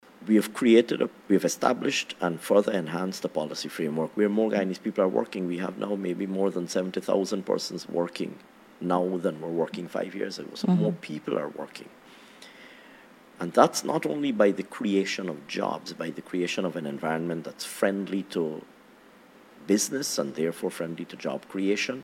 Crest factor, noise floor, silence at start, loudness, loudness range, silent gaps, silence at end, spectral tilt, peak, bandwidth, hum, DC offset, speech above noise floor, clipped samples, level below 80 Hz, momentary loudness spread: 24 dB; -54 dBFS; 0.2 s; -28 LUFS; 4 LU; none; 0 s; -5 dB/octave; -2 dBFS; 16.5 kHz; none; under 0.1%; 27 dB; under 0.1%; -74 dBFS; 11 LU